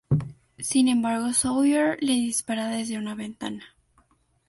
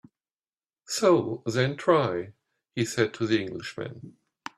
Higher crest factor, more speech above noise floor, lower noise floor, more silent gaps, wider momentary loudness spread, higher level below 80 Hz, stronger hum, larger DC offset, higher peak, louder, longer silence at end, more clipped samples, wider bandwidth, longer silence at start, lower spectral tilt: second, 16 dB vs 22 dB; second, 40 dB vs over 64 dB; second, -64 dBFS vs under -90 dBFS; neither; second, 13 LU vs 16 LU; first, -56 dBFS vs -66 dBFS; neither; neither; second, -10 dBFS vs -6 dBFS; about the same, -25 LUFS vs -26 LUFS; first, 0.8 s vs 0.45 s; neither; second, 12 kHz vs 14 kHz; second, 0.1 s vs 0.9 s; about the same, -4.5 dB/octave vs -5 dB/octave